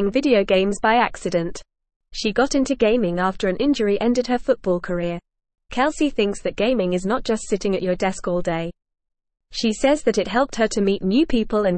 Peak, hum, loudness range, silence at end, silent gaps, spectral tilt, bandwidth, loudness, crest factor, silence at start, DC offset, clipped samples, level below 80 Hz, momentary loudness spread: -4 dBFS; none; 2 LU; 0 s; 1.96-2.00 s; -5 dB/octave; 8.8 kHz; -21 LUFS; 16 dB; 0 s; 0.4%; under 0.1%; -42 dBFS; 7 LU